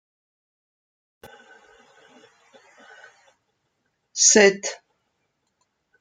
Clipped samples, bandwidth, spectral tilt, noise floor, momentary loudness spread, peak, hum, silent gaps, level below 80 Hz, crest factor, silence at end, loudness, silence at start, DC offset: under 0.1%; 10.5 kHz; -1 dB/octave; -74 dBFS; 22 LU; -2 dBFS; none; none; -72 dBFS; 24 dB; 1.25 s; -17 LUFS; 4.15 s; under 0.1%